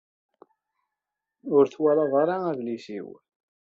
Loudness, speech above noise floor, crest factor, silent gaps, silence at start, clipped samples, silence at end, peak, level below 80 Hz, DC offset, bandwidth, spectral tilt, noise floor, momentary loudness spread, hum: -24 LUFS; 63 dB; 20 dB; none; 1.45 s; under 0.1%; 0.6 s; -8 dBFS; -76 dBFS; under 0.1%; 7.2 kHz; -6.5 dB/octave; -87 dBFS; 17 LU; none